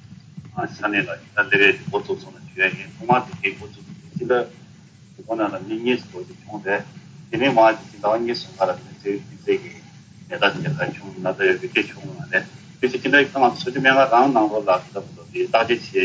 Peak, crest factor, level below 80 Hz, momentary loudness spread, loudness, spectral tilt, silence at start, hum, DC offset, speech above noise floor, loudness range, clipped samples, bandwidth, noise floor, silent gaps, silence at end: -2 dBFS; 20 dB; -60 dBFS; 19 LU; -21 LUFS; -5.5 dB/octave; 0.1 s; none; under 0.1%; 26 dB; 7 LU; under 0.1%; 8 kHz; -47 dBFS; none; 0 s